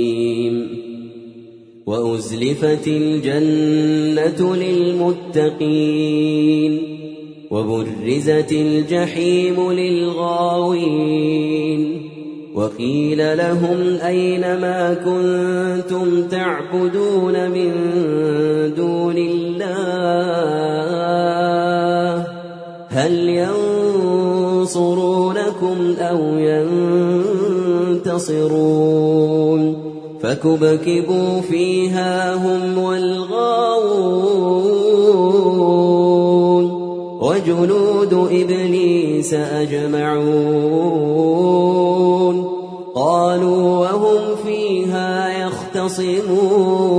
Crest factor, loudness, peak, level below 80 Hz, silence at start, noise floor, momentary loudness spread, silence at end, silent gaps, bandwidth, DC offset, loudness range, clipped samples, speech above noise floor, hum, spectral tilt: 14 dB; -17 LUFS; -2 dBFS; -62 dBFS; 0 s; -40 dBFS; 7 LU; 0 s; none; 10.5 kHz; under 0.1%; 4 LU; under 0.1%; 24 dB; none; -6.5 dB/octave